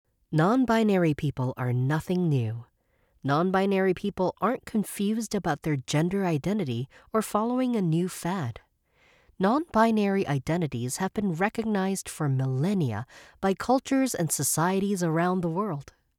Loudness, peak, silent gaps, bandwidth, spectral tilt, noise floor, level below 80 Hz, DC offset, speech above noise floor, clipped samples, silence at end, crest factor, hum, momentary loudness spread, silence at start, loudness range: -27 LUFS; -10 dBFS; none; 18 kHz; -6 dB/octave; -68 dBFS; -58 dBFS; under 0.1%; 42 dB; under 0.1%; 0.35 s; 16 dB; none; 8 LU; 0.3 s; 2 LU